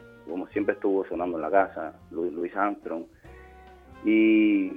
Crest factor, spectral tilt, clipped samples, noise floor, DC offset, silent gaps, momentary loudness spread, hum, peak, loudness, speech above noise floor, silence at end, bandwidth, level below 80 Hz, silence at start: 20 dB; -8 dB/octave; under 0.1%; -49 dBFS; under 0.1%; none; 16 LU; none; -6 dBFS; -26 LUFS; 24 dB; 0 s; 3.7 kHz; -58 dBFS; 0.25 s